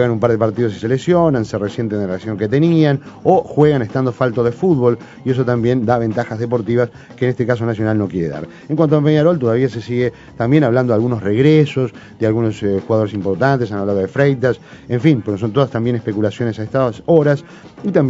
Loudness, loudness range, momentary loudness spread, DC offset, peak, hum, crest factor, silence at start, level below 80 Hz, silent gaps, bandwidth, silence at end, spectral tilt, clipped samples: -16 LUFS; 2 LU; 8 LU; under 0.1%; 0 dBFS; none; 16 dB; 0 s; -50 dBFS; none; 7.8 kHz; 0 s; -8.5 dB/octave; under 0.1%